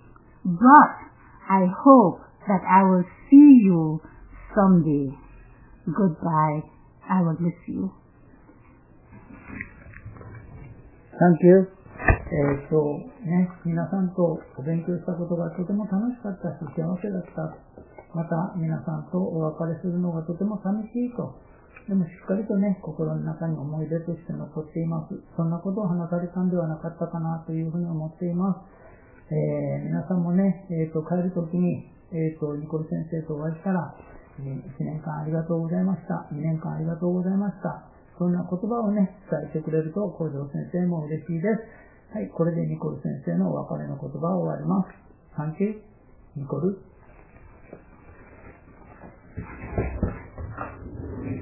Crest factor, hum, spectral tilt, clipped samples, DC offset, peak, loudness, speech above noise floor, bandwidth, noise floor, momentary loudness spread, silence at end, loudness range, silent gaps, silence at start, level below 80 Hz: 24 dB; none; -14 dB/octave; under 0.1%; under 0.1%; 0 dBFS; -24 LUFS; 29 dB; 2.9 kHz; -52 dBFS; 17 LU; 0 s; 13 LU; none; 0.45 s; -46 dBFS